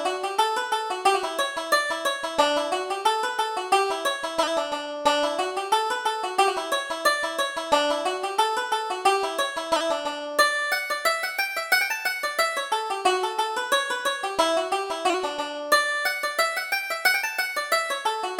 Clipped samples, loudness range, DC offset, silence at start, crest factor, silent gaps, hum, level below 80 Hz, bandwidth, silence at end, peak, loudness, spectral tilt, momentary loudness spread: under 0.1%; 1 LU; under 0.1%; 0 s; 18 dB; none; none; -66 dBFS; over 20 kHz; 0 s; -6 dBFS; -24 LUFS; 0 dB/octave; 5 LU